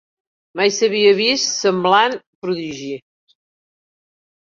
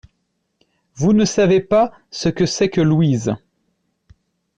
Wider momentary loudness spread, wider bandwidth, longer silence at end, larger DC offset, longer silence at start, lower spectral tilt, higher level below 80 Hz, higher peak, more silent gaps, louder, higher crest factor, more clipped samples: first, 16 LU vs 8 LU; second, 7.6 kHz vs 9.4 kHz; first, 1.5 s vs 1.2 s; neither; second, 0.55 s vs 0.95 s; second, -3 dB/octave vs -6 dB/octave; second, -66 dBFS vs -48 dBFS; first, -2 dBFS vs -6 dBFS; first, 2.27-2.42 s vs none; about the same, -17 LUFS vs -17 LUFS; first, 18 dB vs 12 dB; neither